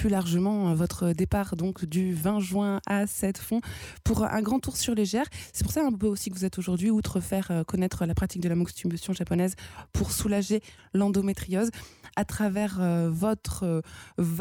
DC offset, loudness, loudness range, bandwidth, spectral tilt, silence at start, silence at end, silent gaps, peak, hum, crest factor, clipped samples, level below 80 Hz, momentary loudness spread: under 0.1%; -28 LUFS; 1 LU; 18.5 kHz; -6 dB/octave; 0 s; 0 s; none; -16 dBFS; none; 12 dB; under 0.1%; -44 dBFS; 6 LU